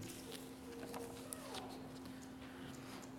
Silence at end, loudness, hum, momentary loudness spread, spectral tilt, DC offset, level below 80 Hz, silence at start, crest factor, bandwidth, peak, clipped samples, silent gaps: 0 s; -50 LUFS; none; 4 LU; -4 dB/octave; under 0.1%; -70 dBFS; 0 s; 28 dB; 19 kHz; -24 dBFS; under 0.1%; none